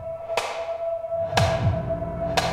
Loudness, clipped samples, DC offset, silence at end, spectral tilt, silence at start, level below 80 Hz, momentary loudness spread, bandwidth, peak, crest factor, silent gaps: -26 LUFS; under 0.1%; under 0.1%; 0 s; -5 dB/octave; 0 s; -40 dBFS; 7 LU; 16 kHz; -4 dBFS; 20 dB; none